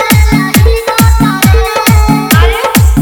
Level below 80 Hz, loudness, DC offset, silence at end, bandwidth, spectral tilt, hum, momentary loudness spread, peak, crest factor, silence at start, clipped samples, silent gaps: -12 dBFS; -8 LUFS; under 0.1%; 0 s; over 20 kHz; -5 dB/octave; none; 1 LU; 0 dBFS; 6 dB; 0 s; 2%; none